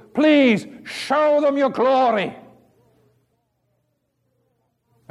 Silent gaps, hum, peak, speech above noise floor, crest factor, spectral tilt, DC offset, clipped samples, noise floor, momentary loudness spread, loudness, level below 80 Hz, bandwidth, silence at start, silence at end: none; none; -6 dBFS; 53 dB; 16 dB; -5.5 dB/octave; under 0.1%; under 0.1%; -70 dBFS; 13 LU; -18 LUFS; -70 dBFS; 12 kHz; 0.15 s; 2.7 s